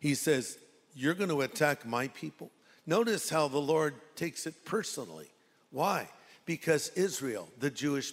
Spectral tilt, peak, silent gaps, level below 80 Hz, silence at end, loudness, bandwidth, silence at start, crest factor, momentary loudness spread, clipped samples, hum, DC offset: -4 dB/octave; -12 dBFS; none; -76 dBFS; 0 s; -32 LUFS; 16 kHz; 0 s; 20 dB; 16 LU; under 0.1%; none; under 0.1%